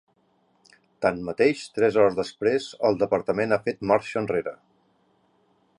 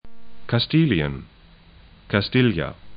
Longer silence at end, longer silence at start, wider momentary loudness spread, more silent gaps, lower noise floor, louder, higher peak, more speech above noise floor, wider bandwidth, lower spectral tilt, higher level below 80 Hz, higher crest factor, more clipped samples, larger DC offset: first, 1.25 s vs 0 s; first, 1 s vs 0.05 s; second, 6 LU vs 12 LU; neither; first, -66 dBFS vs -49 dBFS; second, -24 LUFS vs -21 LUFS; about the same, -6 dBFS vs -4 dBFS; first, 43 dB vs 29 dB; first, 11 kHz vs 5.2 kHz; second, -6 dB/octave vs -11.5 dB/octave; second, -60 dBFS vs -44 dBFS; about the same, 20 dB vs 20 dB; neither; neither